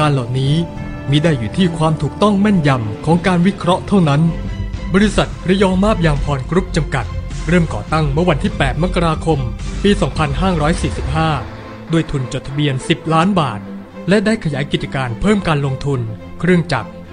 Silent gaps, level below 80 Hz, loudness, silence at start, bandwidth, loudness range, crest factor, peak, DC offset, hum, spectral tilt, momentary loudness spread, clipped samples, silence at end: none; -28 dBFS; -16 LUFS; 0 s; 10.5 kHz; 3 LU; 14 dB; 0 dBFS; under 0.1%; none; -6.5 dB/octave; 8 LU; under 0.1%; 0 s